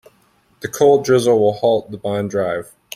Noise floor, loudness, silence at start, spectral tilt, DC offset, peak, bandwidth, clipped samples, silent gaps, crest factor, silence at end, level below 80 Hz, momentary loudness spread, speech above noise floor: -57 dBFS; -17 LUFS; 0.65 s; -5.5 dB/octave; under 0.1%; -2 dBFS; 16 kHz; under 0.1%; none; 16 dB; 0.35 s; -58 dBFS; 13 LU; 41 dB